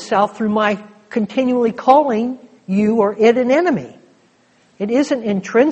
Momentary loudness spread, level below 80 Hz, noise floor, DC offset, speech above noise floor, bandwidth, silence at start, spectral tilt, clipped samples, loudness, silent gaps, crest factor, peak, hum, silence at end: 12 LU; -60 dBFS; -55 dBFS; under 0.1%; 39 dB; 8.4 kHz; 0 s; -6.5 dB/octave; under 0.1%; -17 LUFS; none; 16 dB; 0 dBFS; none; 0 s